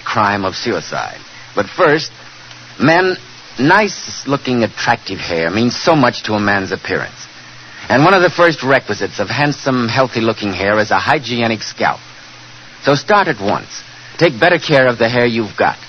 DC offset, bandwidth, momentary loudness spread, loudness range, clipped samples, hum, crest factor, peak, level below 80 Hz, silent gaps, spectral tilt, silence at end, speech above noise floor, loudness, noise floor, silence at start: under 0.1%; 9.2 kHz; 19 LU; 3 LU; under 0.1%; none; 16 dB; 0 dBFS; -50 dBFS; none; -5 dB/octave; 0 s; 22 dB; -14 LUFS; -37 dBFS; 0 s